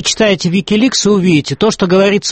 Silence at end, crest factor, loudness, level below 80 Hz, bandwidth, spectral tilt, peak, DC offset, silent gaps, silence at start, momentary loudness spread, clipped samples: 0 s; 12 dB; -11 LUFS; -44 dBFS; 8.8 kHz; -4.5 dB/octave; 0 dBFS; under 0.1%; none; 0 s; 3 LU; under 0.1%